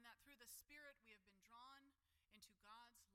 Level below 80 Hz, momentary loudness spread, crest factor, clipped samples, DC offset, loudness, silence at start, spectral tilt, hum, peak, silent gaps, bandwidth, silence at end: -88 dBFS; 9 LU; 18 dB; under 0.1%; under 0.1%; -65 LUFS; 0 s; -1 dB/octave; none; -50 dBFS; none; 16.5 kHz; 0 s